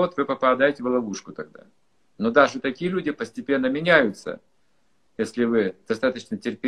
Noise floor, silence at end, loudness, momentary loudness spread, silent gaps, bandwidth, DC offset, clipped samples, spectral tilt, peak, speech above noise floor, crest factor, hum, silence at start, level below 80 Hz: -70 dBFS; 0 s; -23 LUFS; 17 LU; none; 11 kHz; under 0.1%; under 0.1%; -5.5 dB/octave; -2 dBFS; 47 dB; 22 dB; none; 0 s; -62 dBFS